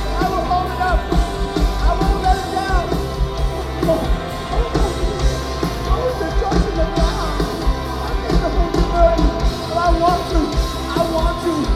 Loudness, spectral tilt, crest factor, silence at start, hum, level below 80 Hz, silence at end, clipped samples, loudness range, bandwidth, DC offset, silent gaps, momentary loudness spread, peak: -19 LUFS; -6 dB/octave; 16 dB; 0 s; none; -20 dBFS; 0 s; under 0.1%; 3 LU; 14 kHz; under 0.1%; none; 6 LU; -2 dBFS